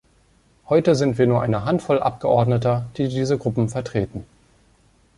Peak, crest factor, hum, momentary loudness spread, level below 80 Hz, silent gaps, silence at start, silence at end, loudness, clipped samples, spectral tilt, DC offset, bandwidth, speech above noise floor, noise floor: -4 dBFS; 18 dB; none; 7 LU; -50 dBFS; none; 0.7 s; 0.95 s; -21 LUFS; under 0.1%; -7.5 dB/octave; under 0.1%; 11.5 kHz; 38 dB; -58 dBFS